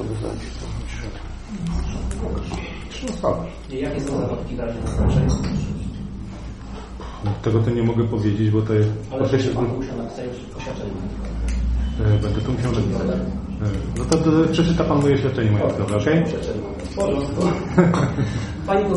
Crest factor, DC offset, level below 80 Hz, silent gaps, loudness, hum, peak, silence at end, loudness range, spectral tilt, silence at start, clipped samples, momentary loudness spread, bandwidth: 20 dB; under 0.1%; -30 dBFS; none; -22 LUFS; none; -2 dBFS; 0 s; 7 LU; -7 dB/octave; 0 s; under 0.1%; 13 LU; 11 kHz